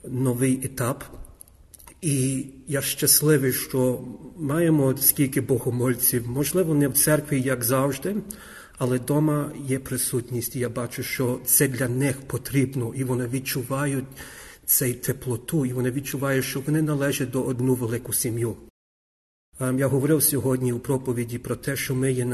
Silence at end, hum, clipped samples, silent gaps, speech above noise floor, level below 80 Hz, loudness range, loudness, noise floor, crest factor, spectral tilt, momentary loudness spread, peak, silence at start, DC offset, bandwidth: 0 s; none; under 0.1%; 18.70-19.52 s; 25 dB; -52 dBFS; 5 LU; -24 LUFS; -49 dBFS; 20 dB; -5 dB/octave; 11 LU; -4 dBFS; 0.05 s; under 0.1%; 13 kHz